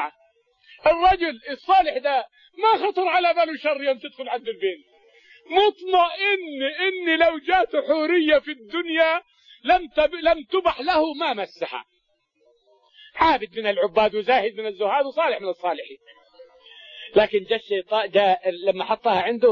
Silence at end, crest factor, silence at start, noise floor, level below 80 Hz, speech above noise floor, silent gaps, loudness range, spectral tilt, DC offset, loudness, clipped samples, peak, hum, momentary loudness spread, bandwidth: 0 s; 18 dB; 0 s; -69 dBFS; -52 dBFS; 48 dB; none; 4 LU; -5.5 dB/octave; under 0.1%; -22 LUFS; under 0.1%; -6 dBFS; none; 10 LU; 6.8 kHz